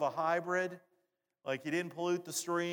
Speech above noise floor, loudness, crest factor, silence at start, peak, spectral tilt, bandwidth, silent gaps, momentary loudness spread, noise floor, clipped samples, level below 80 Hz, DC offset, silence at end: 45 dB; -36 LUFS; 16 dB; 0 s; -20 dBFS; -4 dB/octave; 19 kHz; none; 8 LU; -81 dBFS; under 0.1%; under -90 dBFS; under 0.1%; 0 s